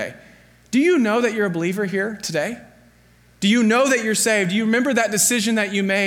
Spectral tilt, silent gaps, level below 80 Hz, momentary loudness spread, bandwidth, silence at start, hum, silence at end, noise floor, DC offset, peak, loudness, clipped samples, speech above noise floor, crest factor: -3.5 dB/octave; none; -62 dBFS; 8 LU; 17.5 kHz; 0 s; 60 Hz at -55 dBFS; 0 s; -53 dBFS; under 0.1%; -6 dBFS; -19 LUFS; under 0.1%; 34 dB; 14 dB